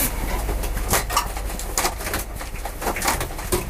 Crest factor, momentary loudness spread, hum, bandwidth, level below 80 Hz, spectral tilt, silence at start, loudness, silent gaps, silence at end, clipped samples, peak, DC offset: 24 dB; 8 LU; none; 16 kHz; -28 dBFS; -3 dB/octave; 0 s; -25 LUFS; none; 0 s; under 0.1%; 0 dBFS; under 0.1%